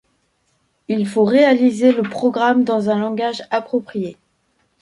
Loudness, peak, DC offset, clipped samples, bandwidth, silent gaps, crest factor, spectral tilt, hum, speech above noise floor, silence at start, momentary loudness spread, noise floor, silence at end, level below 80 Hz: -17 LUFS; -2 dBFS; under 0.1%; under 0.1%; 11.5 kHz; none; 16 dB; -6.5 dB/octave; none; 49 dB; 0.9 s; 11 LU; -65 dBFS; 0.7 s; -66 dBFS